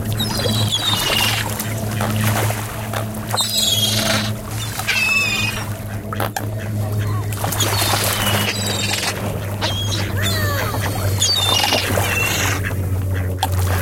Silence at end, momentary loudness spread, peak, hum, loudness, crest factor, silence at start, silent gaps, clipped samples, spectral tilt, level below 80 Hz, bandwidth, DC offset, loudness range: 0 s; 9 LU; -2 dBFS; none; -18 LUFS; 18 dB; 0 s; none; under 0.1%; -3 dB/octave; -38 dBFS; 17 kHz; under 0.1%; 2 LU